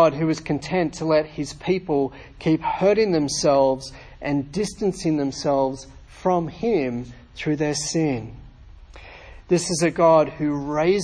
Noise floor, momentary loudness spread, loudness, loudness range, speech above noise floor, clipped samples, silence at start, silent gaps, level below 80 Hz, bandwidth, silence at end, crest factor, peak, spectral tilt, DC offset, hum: -44 dBFS; 12 LU; -22 LUFS; 4 LU; 22 dB; under 0.1%; 0 s; none; -48 dBFS; 10.5 kHz; 0 s; 18 dB; -4 dBFS; -5.5 dB/octave; under 0.1%; none